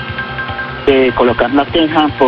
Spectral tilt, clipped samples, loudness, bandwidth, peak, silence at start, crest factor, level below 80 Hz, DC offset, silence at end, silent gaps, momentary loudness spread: -7.5 dB/octave; under 0.1%; -13 LUFS; 6.2 kHz; 0 dBFS; 0 s; 12 dB; -34 dBFS; under 0.1%; 0 s; none; 9 LU